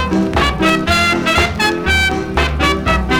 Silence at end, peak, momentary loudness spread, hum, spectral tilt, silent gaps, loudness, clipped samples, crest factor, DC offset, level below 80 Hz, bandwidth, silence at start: 0 s; 0 dBFS; 3 LU; none; -4.5 dB/octave; none; -14 LUFS; under 0.1%; 14 dB; under 0.1%; -24 dBFS; 19 kHz; 0 s